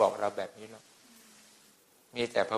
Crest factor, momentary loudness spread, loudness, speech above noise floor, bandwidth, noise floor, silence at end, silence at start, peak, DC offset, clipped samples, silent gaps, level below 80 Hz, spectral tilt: 22 dB; 25 LU; -34 LUFS; 29 dB; 15 kHz; -63 dBFS; 0 s; 0 s; -12 dBFS; under 0.1%; under 0.1%; none; -76 dBFS; -4 dB/octave